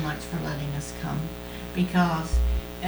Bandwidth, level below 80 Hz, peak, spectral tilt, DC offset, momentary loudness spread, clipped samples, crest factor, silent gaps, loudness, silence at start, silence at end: over 20 kHz; -32 dBFS; -10 dBFS; -6 dB/octave; under 0.1%; 9 LU; under 0.1%; 16 dB; none; -28 LUFS; 0 s; 0 s